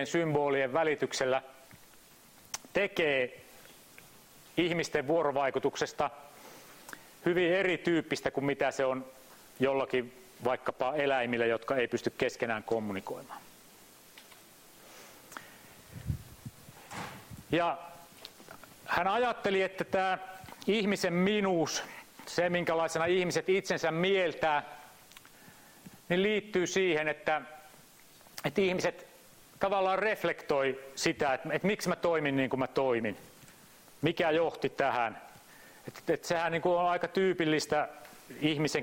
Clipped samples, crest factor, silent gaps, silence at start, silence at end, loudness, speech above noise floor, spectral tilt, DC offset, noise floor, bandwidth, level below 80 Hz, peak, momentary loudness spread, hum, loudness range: under 0.1%; 22 dB; none; 0 s; 0 s; -31 LUFS; 27 dB; -4.5 dB/octave; under 0.1%; -58 dBFS; 16.5 kHz; -64 dBFS; -10 dBFS; 20 LU; none; 8 LU